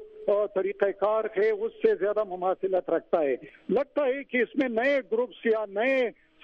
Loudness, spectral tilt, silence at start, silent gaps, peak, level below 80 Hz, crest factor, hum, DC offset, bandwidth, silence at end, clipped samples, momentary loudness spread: -27 LUFS; -7 dB/octave; 0 s; none; -10 dBFS; -68 dBFS; 18 dB; none; under 0.1%; 6.4 kHz; 0.3 s; under 0.1%; 4 LU